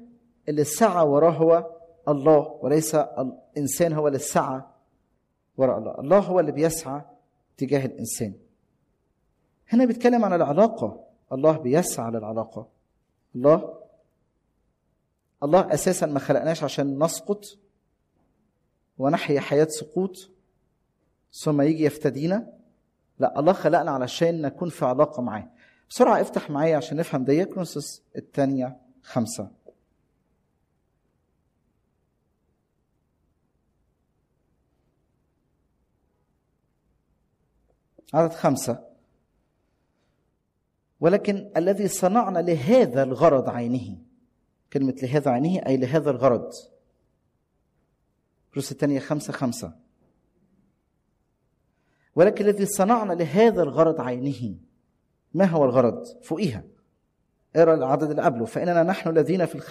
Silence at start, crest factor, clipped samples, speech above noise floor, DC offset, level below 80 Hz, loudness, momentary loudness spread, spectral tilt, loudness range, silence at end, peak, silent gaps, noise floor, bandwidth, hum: 0 s; 18 dB; under 0.1%; 52 dB; under 0.1%; -64 dBFS; -23 LUFS; 13 LU; -6 dB/octave; 9 LU; 0 s; -6 dBFS; none; -74 dBFS; 15 kHz; none